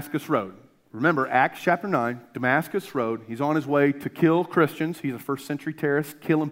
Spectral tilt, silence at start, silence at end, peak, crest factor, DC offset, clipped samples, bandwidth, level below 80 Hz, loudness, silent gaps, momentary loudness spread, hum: -7 dB/octave; 0 s; 0 s; -4 dBFS; 20 dB; under 0.1%; under 0.1%; 16 kHz; -72 dBFS; -25 LUFS; none; 8 LU; none